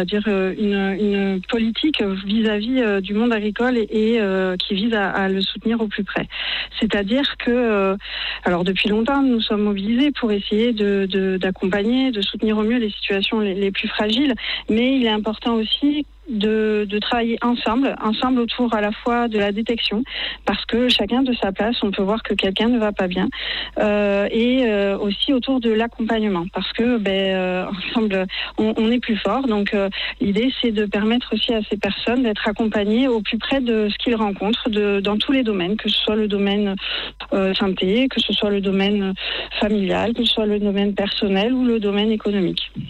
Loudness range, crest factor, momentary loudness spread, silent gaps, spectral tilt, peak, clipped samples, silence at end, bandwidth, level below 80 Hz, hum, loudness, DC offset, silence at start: 1 LU; 12 dB; 4 LU; none; -6.5 dB/octave; -8 dBFS; under 0.1%; 0 s; 8.4 kHz; -44 dBFS; none; -20 LUFS; under 0.1%; 0 s